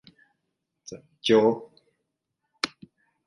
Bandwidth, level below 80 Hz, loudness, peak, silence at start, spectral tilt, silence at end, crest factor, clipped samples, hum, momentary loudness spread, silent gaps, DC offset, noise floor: 11.5 kHz; -74 dBFS; -25 LUFS; -4 dBFS; 0.9 s; -4.5 dB/octave; 0.6 s; 24 dB; under 0.1%; none; 24 LU; none; under 0.1%; -81 dBFS